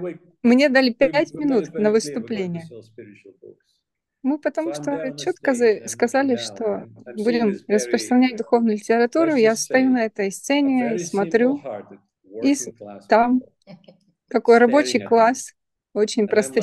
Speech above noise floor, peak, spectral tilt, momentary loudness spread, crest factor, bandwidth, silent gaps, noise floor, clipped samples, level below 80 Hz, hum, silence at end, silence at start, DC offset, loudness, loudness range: 56 dB; -2 dBFS; -4.5 dB/octave; 12 LU; 18 dB; 12.5 kHz; none; -75 dBFS; under 0.1%; -64 dBFS; none; 0 s; 0 s; under 0.1%; -20 LUFS; 6 LU